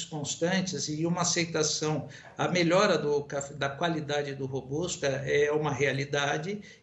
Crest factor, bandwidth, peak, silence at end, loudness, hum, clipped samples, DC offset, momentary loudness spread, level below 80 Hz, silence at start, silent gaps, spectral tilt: 16 dB; 8.4 kHz; -12 dBFS; 0.05 s; -29 LUFS; none; under 0.1%; under 0.1%; 9 LU; -62 dBFS; 0 s; none; -4 dB/octave